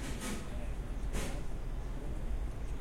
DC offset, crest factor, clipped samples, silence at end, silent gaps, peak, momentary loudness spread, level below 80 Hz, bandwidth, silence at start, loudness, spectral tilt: under 0.1%; 12 dB; under 0.1%; 0 s; none; -24 dBFS; 4 LU; -38 dBFS; 16 kHz; 0 s; -42 LUFS; -5 dB/octave